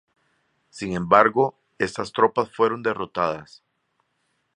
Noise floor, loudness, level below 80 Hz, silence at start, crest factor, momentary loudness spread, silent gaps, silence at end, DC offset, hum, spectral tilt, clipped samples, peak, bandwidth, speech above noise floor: -72 dBFS; -22 LUFS; -58 dBFS; 0.75 s; 22 dB; 12 LU; none; 1.1 s; under 0.1%; none; -5.5 dB/octave; under 0.1%; -2 dBFS; 10.5 kHz; 50 dB